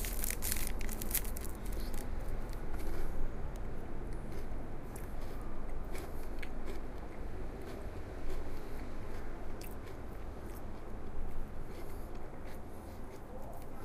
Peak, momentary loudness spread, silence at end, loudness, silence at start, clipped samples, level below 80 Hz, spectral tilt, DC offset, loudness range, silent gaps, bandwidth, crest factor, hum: -16 dBFS; 11 LU; 0 s; -44 LUFS; 0 s; under 0.1%; -40 dBFS; -4.5 dB/octave; under 0.1%; 7 LU; none; 16 kHz; 20 dB; none